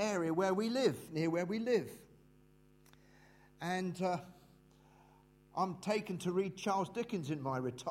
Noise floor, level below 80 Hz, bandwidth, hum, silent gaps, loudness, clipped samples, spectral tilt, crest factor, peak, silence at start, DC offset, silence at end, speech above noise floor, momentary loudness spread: -65 dBFS; -72 dBFS; 16 kHz; none; none; -37 LUFS; under 0.1%; -5.5 dB/octave; 20 dB; -18 dBFS; 0 s; under 0.1%; 0 s; 29 dB; 8 LU